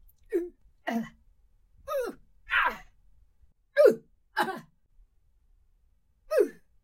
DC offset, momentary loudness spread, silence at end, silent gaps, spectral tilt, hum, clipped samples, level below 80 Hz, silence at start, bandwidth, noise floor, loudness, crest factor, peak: under 0.1%; 20 LU; 0.3 s; none; -4 dB/octave; none; under 0.1%; -60 dBFS; 0.3 s; 16.5 kHz; -67 dBFS; -29 LUFS; 22 dB; -8 dBFS